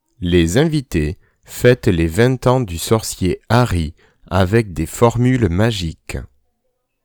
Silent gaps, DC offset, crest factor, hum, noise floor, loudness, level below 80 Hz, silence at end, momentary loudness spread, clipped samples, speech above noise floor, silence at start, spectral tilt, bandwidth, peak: none; under 0.1%; 16 dB; none; -69 dBFS; -17 LUFS; -34 dBFS; 0.8 s; 12 LU; under 0.1%; 53 dB; 0.2 s; -6 dB/octave; over 20 kHz; 0 dBFS